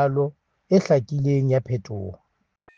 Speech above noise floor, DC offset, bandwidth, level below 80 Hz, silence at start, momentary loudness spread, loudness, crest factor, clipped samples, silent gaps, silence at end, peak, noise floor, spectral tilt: 40 dB; under 0.1%; 7.2 kHz; -60 dBFS; 0 s; 15 LU; -22 LUFS; 18 dB; under 0.1%; none; 0.6 s; -6 dBFS; -61 dBFS; -8.5 dB/octave